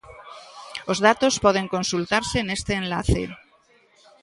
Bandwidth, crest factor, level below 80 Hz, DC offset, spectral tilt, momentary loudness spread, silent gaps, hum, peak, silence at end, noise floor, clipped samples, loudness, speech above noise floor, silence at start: 11.5 kHz; 22 dB; -40 dBFS; under 0.1%; -4 dB/octave; 21 LU; none; none; -2 dBFS; 0.85 s; -58 dBFS; under 0.1%; -22 LUFS; 37 dB; 0.05 s